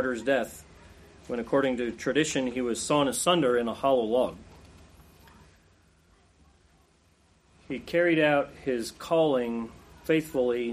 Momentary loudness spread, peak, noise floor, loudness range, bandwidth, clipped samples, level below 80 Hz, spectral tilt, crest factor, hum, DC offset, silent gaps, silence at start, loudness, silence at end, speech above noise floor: 13 LU; -10 dBFS; -63 dBFS; 7 LU; 15 kHz; under 0.1%; -58 dBFS; -4 dB/octave; 18 dB; none; under 0.1%; none; 0 s; -27 LUFS; 0 s; 37 dB